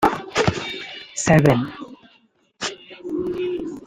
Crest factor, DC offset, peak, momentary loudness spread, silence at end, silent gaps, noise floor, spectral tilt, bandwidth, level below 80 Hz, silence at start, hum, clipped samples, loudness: 20 dB; under 0.1%; -2 dBFS; 16 LU; 0 s; none; -59 dBFS; -5 dB/octave; 15.5 kHz; -48 dBFS; 0 s; none; under 0.1%; -22 LUFS